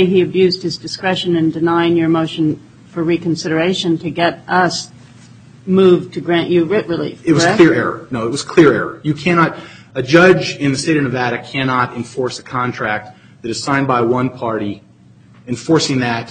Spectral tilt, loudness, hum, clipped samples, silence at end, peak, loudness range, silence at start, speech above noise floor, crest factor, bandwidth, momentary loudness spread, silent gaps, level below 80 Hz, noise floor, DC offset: -5.5 dB/octave; -15 LUFS; none; under 0.1%; 0 s; 0 dBFS; 5 LU; 0 s; 30 dB; 16 dB; 9.4 kHz; 12 LU; none; -52 dBFS; -45 dBFS; under 0.1%